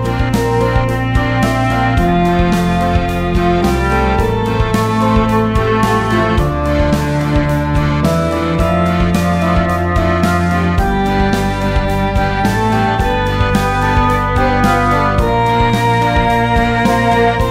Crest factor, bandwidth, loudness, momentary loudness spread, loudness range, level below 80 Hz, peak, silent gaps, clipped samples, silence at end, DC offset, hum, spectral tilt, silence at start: 12 dB; 16 kHz; -14 LUFS; 3 LU; 2 LU; -22 dBFS; -2 dBFS; none; under 0.1%; 0 s; under 0.1%; none; -6.5 dB/octave; 0 s